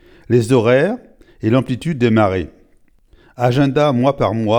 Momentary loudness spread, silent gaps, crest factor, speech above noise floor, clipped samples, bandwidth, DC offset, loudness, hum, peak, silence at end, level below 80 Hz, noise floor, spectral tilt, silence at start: 9 LU; none; 16 dB; 37 dB; under 0.1%; 15.5 kHz; under 0.1%; -16 LUFS; none; 0 dBFS; 0 s; -46 dBFS; -52 dBFS; -7.5 dB/octave; 0.3 s